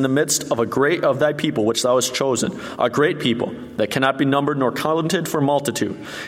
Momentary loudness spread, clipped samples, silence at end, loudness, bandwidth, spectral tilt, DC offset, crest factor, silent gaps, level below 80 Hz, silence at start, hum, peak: 6 LU; under 0.1%; 0 s; -20 LUFS; 16.5 kHz; -4 dB/octave; under 0.1%; 18 dB; none; -58 dBFS; 0 s; none; -2 dBFS